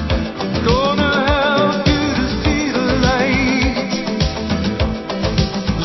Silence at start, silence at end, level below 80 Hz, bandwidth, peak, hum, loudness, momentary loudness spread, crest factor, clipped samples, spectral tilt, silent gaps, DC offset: 0 s; 0 s; -26 dBFS; 6.2 kHz; -2 dBFS; none; -17 LUFS; 6 LU; 16 dB; under 0.1%; -5.5 dB/octave; none; under 0.1%